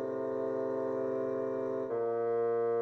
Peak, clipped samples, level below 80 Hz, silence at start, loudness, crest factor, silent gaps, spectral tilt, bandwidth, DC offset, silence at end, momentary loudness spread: -24 dBFS; under 0.1%; -78 dBFS; 0 s; -34 LUFS; 8 dB; none; -9 dB/octave; 6 kHz; under 0.1%; 0 s; 4 LU